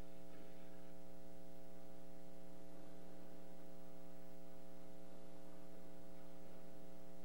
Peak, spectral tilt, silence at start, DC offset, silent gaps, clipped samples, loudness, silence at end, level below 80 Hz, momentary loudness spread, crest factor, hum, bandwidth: -38 dBFS; -6 dB/octave; 0 s; 0.8%; none; under 0.1%; -61 LUFS; 0 s; -76 dBFS; 1 LU; 12 dB; none; 16 kHz